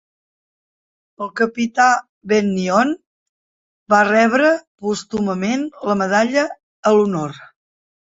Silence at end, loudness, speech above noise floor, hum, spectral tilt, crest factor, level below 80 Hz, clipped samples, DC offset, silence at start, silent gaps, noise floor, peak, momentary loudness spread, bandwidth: 0.65 s; -17 LUFS; over 73 dB; none; -5 dB/octave; 18 dB; -60 dBFS; under 0.1%; under 0.1%; 1.2 s; 2.09-2.21 s, 3.07-3.86 s, 4.67-4.78 s, 6.63-6.83 s; under -90 dBFS; -2 dBFS; 10 LU; 8 kHz